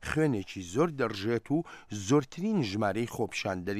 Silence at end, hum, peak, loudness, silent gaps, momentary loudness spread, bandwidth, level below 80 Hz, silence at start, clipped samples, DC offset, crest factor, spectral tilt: 0 s; none; -14 dBFS; -31 LUFS; none; 6 LU; 15 kHz; -58 dBFS; 0 s; under 0.1%; under 0.1%; 16 dB; -6 dB/octave